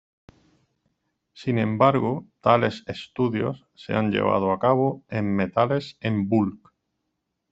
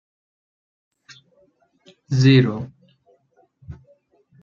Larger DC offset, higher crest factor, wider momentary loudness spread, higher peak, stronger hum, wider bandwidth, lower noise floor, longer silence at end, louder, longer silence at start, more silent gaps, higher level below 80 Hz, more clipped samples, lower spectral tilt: neither; about the same, 20 dB vs 22 dB; second, 9 LU vs 28 LU; about the same, -4 dBFS vs -2 dBFS; neither; first, 8 kHz vs 7.2 kHz; first, -79 dBFS vs -61 dBFS; first, 0.95 s vs 0.7 s; second, -24 LUFS vs -17 LUFS; second, 1.35 s vs 2.1 s; neither; about the same, -60 dBFS vs -58 dBFS; neither; about the same, -8 dB/octave vs -7 dB/octave